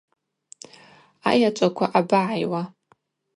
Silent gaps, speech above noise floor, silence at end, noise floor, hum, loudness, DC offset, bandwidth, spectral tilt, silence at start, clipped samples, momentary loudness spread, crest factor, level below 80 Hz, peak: none; 43 dB; 0.7 s; -63 dBFS; none; -22 LUFS; under 0.1%; 11.5 kHz; -5.5 dB/octave; 1.25 s; under 0.1%; 18 LU; 22 dB; -72 dBFS; -2 dBFS